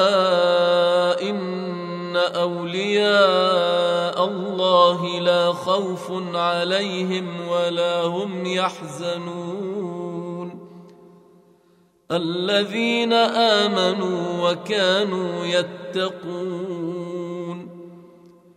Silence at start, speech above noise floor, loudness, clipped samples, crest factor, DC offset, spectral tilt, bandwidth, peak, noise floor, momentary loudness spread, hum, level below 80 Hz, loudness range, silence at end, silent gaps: 0 s; 37 dB; -21 LUFS; under 0.1%; 20 dB; under 0.1%; -5 dB/octave; 12 kHz; -2 dBFS; -58 dBFS; 13 LU; none; -74 dBFS; 9 LU; 0.5 s; none